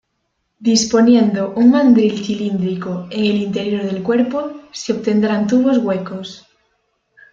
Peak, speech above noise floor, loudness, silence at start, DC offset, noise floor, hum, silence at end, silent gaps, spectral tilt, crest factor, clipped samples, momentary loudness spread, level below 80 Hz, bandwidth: -2 dBFS; 55 dB; -16 LUFS; 0.6 s; under 0.1%; -70 dBFS; none; 0.95 s; none; -5.5 dB/octave; 14 dB; under 0.1%; 12 LU; -56 dBFS; 7.8 kHz